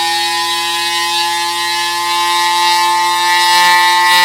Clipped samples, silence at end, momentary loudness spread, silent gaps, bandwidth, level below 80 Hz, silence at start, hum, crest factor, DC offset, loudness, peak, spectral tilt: under 0.1%; 0 s; 6 LU; none; 17 kHz; -68 dBFS; 0 s; none; 12 dB; under 0.1%; -11 LUFS; 0 dBFS; 1 dB/octave